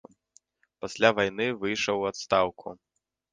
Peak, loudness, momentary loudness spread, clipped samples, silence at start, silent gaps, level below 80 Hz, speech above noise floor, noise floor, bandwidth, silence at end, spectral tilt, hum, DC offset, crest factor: -4 dBFS; -26 LUFS; 17 LU; under 0.1%; 0.85 s; none; -62 dBFS; 38 dB; -64 dBFS; 10 kHz; 0.6 s; -4 dB/octave; none; under 0.1%; 24 dB